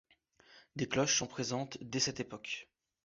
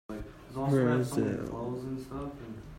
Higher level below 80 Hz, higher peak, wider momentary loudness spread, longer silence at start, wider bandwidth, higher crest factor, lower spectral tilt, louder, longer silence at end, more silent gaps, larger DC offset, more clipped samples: second, -68 dBFS vs -52 dBFS; about the same, -18 dBFS vs -16 dBFS; second, 12 LU vs 16 LU; first, 0.5 s vs 0.1 s; second, 7.6 kHz vs 16 kHz; about the same, 20 dB vs 18 dB; second, -3 dB/octave vs -7.5 dB/octave; second, -35 LUFS vs -32 LUFS; first, 0.4 s vs 0 s; neither; neither; neither